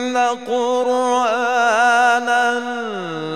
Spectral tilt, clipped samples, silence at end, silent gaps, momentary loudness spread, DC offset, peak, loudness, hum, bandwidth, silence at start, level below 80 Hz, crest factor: -3 dB/octave; under 0.1%; 0 s; none; 11 LU; 0.3%; -4 dBFS; -17 LUFS; none; 13 kHz; 0 s; -76 dBFS; 14 dB